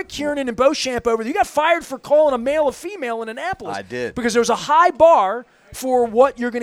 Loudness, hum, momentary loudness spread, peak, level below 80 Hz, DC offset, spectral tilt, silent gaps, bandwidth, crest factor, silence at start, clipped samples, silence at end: -18 LUFS; none; 13 LU; -2 dBFS; -50 dBFS; under 0.1%; -3.5 dB/octave; none; 15.5 kHz; 16 dB; 0 s; under 0.1%; 0 s